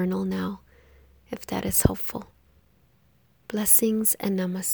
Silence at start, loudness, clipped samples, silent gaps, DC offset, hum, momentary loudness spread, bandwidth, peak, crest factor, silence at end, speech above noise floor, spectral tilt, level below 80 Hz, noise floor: 0 s; -23 LUFS; under 0.1%; none; under 0.1%; none; 21 LU; over 20 kHz; -2 dBFS; 24 dB; 0 s; 38 dB; -4.5 dB/octave; -42 dBFS; -63 dBFS